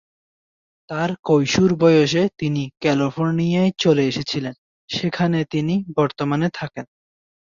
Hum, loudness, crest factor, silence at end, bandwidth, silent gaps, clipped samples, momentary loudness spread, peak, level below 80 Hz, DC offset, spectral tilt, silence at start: none; -20 LUFS; 16 dB; 0.7 s; 7.4 kHz; 1.19-1.23 s, 4.58-4.88 s; under 0.1%; 11 LU; -4 dBFS; -56 dBFS; under 0.1%; -6 dB/octave; 0.9 s